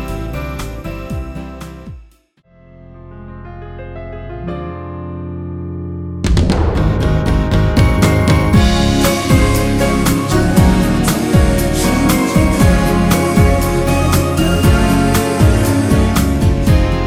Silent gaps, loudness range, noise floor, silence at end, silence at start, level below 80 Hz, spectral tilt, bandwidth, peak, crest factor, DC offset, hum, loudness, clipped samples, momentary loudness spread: none; 17 LU; -50 dBFS; 0 s; 0 s; -20 dBFS; -6 dB/octave; 16.5 kHz; 0 dBFS; 14 dB; under 0.1%; none; -13 LUFS; under 0.1%; 17 LU